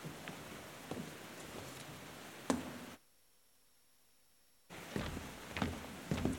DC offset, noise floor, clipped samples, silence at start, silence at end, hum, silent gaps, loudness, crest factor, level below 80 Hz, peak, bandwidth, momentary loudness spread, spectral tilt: under 0.1%; -72 dBFS; under 0.1%; 0 s; 0 s; none; none; -45 LUFS; 30 dB; -60 dBFS; -14 dBFS; 17 kHz; 11 LU; -5 dB/octave